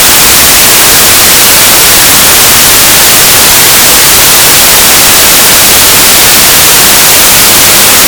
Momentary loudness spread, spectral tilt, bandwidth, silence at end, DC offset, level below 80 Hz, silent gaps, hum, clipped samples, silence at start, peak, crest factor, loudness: 0 LU; 0 dB/octave; over 20 kHz; 0 s; under 0.1%; -26 dBFS; none; none; 40%; 0 s; 0 dBFS; 2 dB; 1 LUFS